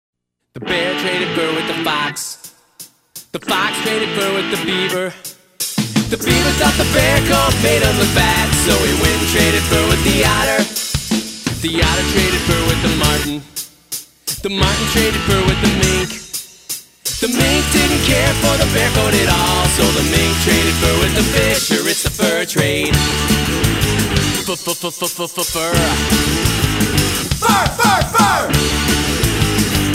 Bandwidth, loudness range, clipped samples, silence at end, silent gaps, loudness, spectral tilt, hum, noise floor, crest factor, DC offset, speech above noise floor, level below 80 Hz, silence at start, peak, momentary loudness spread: 16.5 kHz; 6 LU; under 0.1%; 0 s; none; -15 LUFS; -3.5 dB/octave; none; -41 dBFS; 16 dB; under 0.1%; 26 dB; -26 dBFS; 0.55 s; 0 dBFS; 9 LU